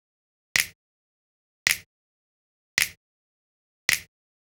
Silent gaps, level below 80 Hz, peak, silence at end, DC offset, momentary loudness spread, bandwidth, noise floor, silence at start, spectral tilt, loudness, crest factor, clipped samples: 0.75-1.66 s, 1.86-2.77 s, 2.97-3.88 s; -62 dBFS; 0 dBFS; 0.4 s; under 0.1%; 4 LU; over 20 kHz; under -90 dBFS; 0.55 s; 1 dB/octave; -26 LUFS; 32 dB; under 0.1%